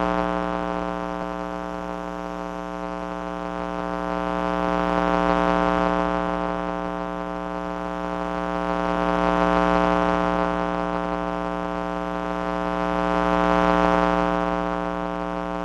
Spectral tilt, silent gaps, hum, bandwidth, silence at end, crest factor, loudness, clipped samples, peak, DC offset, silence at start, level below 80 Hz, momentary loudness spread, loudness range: -7 dB/octave; none; none; 10 kHz; 0 s; 22 dB; -24 LUFS; under 0.1%; -2 dBFS; under 0.1%; 0 s; -40 dBFS; 10 LU; 6 LU